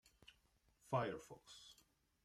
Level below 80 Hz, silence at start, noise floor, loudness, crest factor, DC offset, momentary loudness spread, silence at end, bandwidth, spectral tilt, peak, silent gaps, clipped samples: -78 dBFS; 0.9 s; -78 dBFS; -45 LUFS; 22 dB; under 0.1%; 24 LU; 0.5 s; 15 kHz; -5.5 dB/octave; -26 dBFS; none; under 0.1%